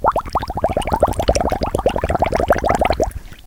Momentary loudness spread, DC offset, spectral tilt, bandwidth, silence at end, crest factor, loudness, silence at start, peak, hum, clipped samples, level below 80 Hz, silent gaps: 4 LU; under 0.1%; -5.5 dB/octave; 18 kHz; 0.05 s; 18 dB; -19 LUFS; 0 s; 0 dBFS; none; under 0.1%; -28 dBFS; none